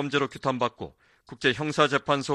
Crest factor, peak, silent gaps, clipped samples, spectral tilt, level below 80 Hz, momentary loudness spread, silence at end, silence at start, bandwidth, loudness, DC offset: 20 dB; -6 dBFS; none; under 0.1%; -4.5 dB/octave; -62 dBFS; 11 LU; 0 s; 0 s; 12 kHz; -26 LUFS; under 0.1%